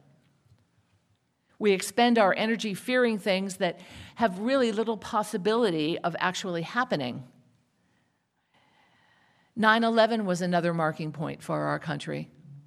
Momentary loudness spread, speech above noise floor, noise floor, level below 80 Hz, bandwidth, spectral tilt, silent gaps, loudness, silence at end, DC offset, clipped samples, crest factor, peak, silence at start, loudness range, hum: 12 LU; 47 dB; -74 dBFS; -72 dBFS; 14.5 kHz; -5 dB/octave; none; -27 LUFS; 0.05 s; under 0.1%; under 0.1%; 22 dB; -6 dBFS; 1.6 s; 6 LU; none